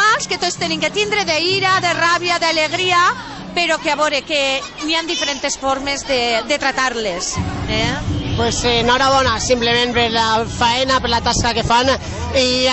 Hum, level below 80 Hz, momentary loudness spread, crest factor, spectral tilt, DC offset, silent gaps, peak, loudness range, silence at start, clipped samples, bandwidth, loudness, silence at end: none; -36 dBFS; 6 LU; 14 dB; -3 dB/octave; under 0.1%; none; -2 dBFS; 3 LU; 0 s; under 0.1%; 8.4 kHz; -16 LUFS; 0 s